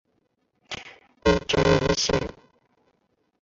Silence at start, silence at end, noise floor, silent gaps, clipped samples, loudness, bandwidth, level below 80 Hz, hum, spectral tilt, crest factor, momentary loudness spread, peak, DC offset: 0.7 s; 1.15 s; -71 dBFS; none; under 0.1%; -22 LUFS; 7.8 kHz; -40 dBFS; none; -4.5 dB/octave; 20 dB; 17 LU; -6 dBFS; under 0.1%